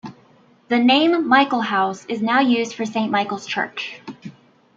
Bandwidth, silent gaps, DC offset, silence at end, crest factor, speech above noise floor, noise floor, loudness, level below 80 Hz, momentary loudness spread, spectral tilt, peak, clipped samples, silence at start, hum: 7.6 kHz; none; under 0.1%; 0.45 s; 18 dB; 34 dB; -53 dBFS; -19 LUFS; -72 dBFS; 17 LU; -4.5 dB/octave; -2 dBFS; under 0.1%; 0.05 s; none